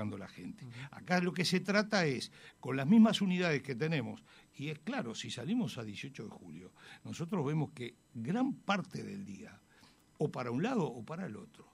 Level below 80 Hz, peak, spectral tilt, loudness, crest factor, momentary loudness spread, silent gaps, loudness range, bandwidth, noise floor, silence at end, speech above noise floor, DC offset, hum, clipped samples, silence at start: -76 dBFS; -16 dBFS; -6 dB/octave; -35 LUFS; 20 dB; 18 LU; none; 8 LU; 13.5 kHz; -64 dBFS; 0.1 s; 29 dB; under 0.1%; none; under 0.1%; 0 s